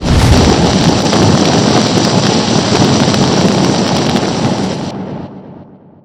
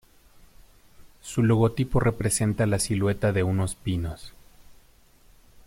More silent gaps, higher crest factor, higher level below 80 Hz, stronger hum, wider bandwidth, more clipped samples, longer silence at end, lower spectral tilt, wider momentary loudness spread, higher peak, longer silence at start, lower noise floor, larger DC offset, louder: neither; second, 10 dB vs 16 dB; first, -24 dBFS vs -44 dBFS; neither; about the same, 15.5 kHz vs 16 kHz; first, 0.3% vs under 0.1%; second, 0.4 s vs 0.95 s; about the same, -5 dB/octave vs -6 dB/octave; about the same, 11 LU vs 10 LU; first, 0 dBFS vs -10 dBFS; second, 0 s vs 0.6 s; second, -36 dBFS vs -56 dBFS; first, 0.4% vs under 0.1%; first, -10 LUFS vs -25 LUFS